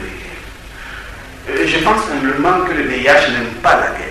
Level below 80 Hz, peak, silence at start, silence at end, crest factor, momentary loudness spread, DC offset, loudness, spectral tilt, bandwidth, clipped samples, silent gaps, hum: -36 dBFS; 0 dBFS; 0 s; 0 s; 16 dB; 20 LU; under 0.1%; -14 LUFS; -4 dB/octave; 14 kHz; under 0.1%; none; none